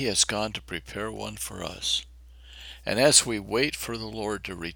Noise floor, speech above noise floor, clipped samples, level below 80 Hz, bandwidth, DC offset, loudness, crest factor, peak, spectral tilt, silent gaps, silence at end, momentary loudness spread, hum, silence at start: -48 dBFS; 21 dB; under 0.1%; -50 dBFS; over 20 kHz; under 0.1%; -26 LUFS; 26 dB; -2 dBFS; -2 dB/octave; none; 0 s; 17 LU; none; 0 s